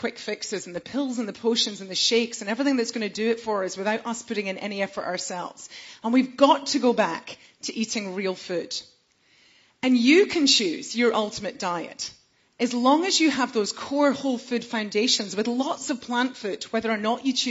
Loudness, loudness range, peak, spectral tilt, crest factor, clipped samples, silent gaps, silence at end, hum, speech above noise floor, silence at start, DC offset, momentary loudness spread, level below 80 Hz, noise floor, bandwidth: -24 LUFS; 5 LU; -4 dBFS; -3 dB/octave; 22 dB; under 0.1%; none; 0 s; none; 37 dB; 0 s; under 0.1%; 13 LU; -68 dBFS; -62 dBFS; 8 kHz